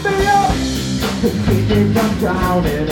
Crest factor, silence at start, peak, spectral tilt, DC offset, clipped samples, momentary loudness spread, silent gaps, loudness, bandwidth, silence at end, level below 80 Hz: 14 dB; 0 s; -2 dBFS; -5.5 dB/octave; under 0.1%; under 0.1%; 5 LU; none; -16 LUFS; 18 kHz; 0 s; -28 dBFS